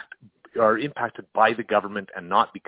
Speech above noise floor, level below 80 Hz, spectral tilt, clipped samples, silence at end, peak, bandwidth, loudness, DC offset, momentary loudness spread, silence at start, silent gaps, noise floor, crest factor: 26 dB; -66 dBFS; -8.5 dB/octave; under 0.1%; 0.1 s; -4 dBFS; 4 kHz; -23 LUFS; under 0.1%; 11 LU; 0.55 s; none; -49 dBFS; 20 dB